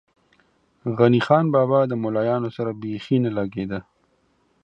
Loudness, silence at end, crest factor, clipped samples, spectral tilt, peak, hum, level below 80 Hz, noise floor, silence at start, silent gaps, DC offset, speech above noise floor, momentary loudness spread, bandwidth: -21 LUFS; 0.85 s; 20 dB; under 0.1%; -9 dB/octave; -2 dBFS; none; -58 dBFS; -65 dBFS; 0.85 s; none; under 0.1%; 44 dB; 13 LU; 8 kHz